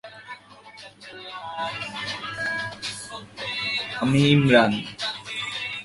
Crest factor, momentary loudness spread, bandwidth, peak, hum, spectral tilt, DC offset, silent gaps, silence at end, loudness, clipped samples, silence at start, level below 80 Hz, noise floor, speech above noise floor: 22 dB; 23 LU; 11.5 kHz; -2 dBFS; none; -5.5 dB/octave; under 0.1%; none; 0 s; -24 LUFS; under 0.1%; 0.05 s; -56 dBFS; -46 dBFS; 26 dB